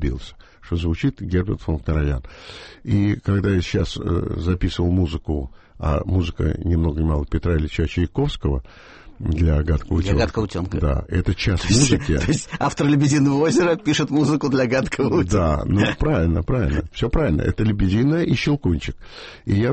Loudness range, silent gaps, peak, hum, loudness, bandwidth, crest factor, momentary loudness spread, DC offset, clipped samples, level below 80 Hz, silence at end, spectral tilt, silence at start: 4 LU; none; -4 dBFS; none; -21 LUFS; 8.8 kHz; 16 dB; 9 LU; under 0.1%; under 0.1%; -28 dBFS; 0 s; -6 dB/octave; 0 s